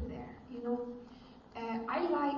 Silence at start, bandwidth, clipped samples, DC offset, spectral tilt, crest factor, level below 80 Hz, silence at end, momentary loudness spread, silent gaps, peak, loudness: 0 s; 6.8 kHz; under 0.1%; under 0.1%; -5 dB/octave; 16 dB; -58 dBFS; 0 s; 17 LU; none; -22 dBFS; -38 LUFS